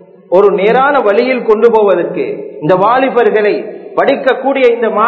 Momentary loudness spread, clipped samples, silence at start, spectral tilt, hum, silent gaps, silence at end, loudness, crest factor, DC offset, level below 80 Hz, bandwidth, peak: 9 LU; 0.7%; 0.3 s; -7.5 dB/octave; none; none; 0 s; -11 LUFS; 10 dB; under 0.1%; -58 dBFS; 6 kHz; 0 dBFS